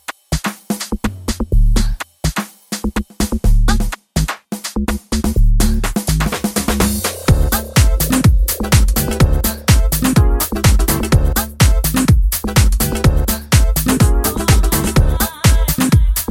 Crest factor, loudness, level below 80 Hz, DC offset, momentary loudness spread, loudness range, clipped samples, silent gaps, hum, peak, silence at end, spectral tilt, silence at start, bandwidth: 14 dB; -16 LUFS; -16 dBFS; under 0.1%; 8 LU; 6 LU; under 0.1%; none; none; 0 dBFS; 0.05 s; -5 dB/octave; 0.1 s; 17 kHz